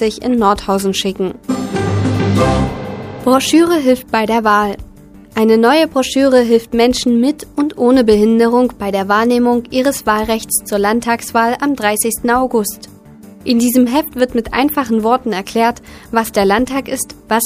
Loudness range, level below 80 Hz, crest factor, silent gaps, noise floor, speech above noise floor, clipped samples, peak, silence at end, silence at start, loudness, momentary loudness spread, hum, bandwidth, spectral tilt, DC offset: 3 LU; -38 dBFS; 14 dB; none; -38 dBFS; 24 dB; under 0.1%; 0 dBFS; 0 s; 0 s; -14 LUFS; 8 LU; none; 15.5 kHz; -4.5 dB/octave; under 0.1%